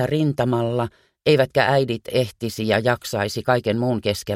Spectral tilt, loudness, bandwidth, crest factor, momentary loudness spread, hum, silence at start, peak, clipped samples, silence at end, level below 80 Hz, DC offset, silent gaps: -6 dB/octave; -21 LUFS; 16.5 kHz; 18 dB; 7 LU; none; 0 s; -2 dBFS; under 0.1%; 0 s; -54 dBFS; under 0.1%; none